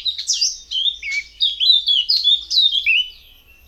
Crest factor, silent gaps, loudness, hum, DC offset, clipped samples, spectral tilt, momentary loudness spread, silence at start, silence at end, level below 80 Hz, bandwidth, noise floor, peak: 16 dB; none; -15 LUFS; none; under 0.1%; under 0.1%; 5 dB/octave; 7 LU; 0 s; 0.55 s; -52 dBFS; 15.5 kHz; -47 dBFS; -4 dBFS